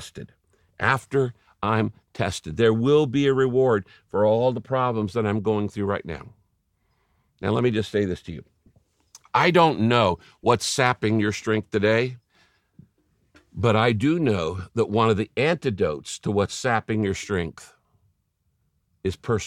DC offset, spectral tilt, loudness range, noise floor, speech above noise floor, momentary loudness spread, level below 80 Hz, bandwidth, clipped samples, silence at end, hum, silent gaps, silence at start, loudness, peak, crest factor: under 0.1%; -5.5 dB/octave; 6 LU; -72 dBFS; 49 dB; 11 LU; -54 dBFS; 14.5 kHz; under 0.1%; 0 s; none; none; 0 s; -23 LUFS; -4 dBFS; 20 dB